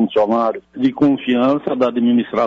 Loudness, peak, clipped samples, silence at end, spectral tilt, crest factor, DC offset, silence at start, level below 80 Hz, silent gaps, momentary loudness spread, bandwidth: -17 LUFS; -6 dBFS; under 0.1%; 0 s; -8 dB/octave; 10 dB; under 0.1%; 0 s; -58 dBFS; none; 5 LU; 6.2 kHz